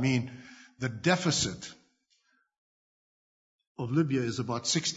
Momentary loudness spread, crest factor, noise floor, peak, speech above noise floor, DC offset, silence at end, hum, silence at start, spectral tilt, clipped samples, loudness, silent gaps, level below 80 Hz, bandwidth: 20 LU; 22 dB; -72 dBFS; -10 dBFS; 42 dB; under 0.1%; 0 s; none; 0 s; -4 dB/octave; under 0.1%; -30 LUFS; 2.58-3.59 s, 3.67-3.75 s; -64 dBFS; 8 kHz